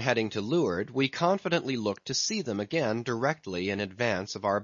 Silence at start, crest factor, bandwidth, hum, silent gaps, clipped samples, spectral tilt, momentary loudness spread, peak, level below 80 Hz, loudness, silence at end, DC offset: 0 s; 20 dB; 7.4 kHz; none; none; under 0.1%; -4.5 dB/octave; 5 LU; -8 dBFS; -68 dBFS; -29 LUFS; 0 s; under 0.1%